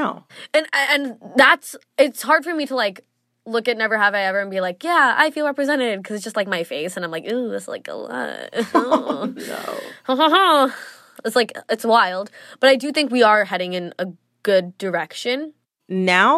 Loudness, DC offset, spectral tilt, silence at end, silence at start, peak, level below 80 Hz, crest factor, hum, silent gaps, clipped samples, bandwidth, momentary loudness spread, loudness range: -19 LUFS; under 0.1%; -3.5 dB/octave; 0 s; 0 s; -2 dBFS; -80 dBFS; 18 dB; none; none; under 0.1%; 14.5 kHz; 15 LU; 6 LU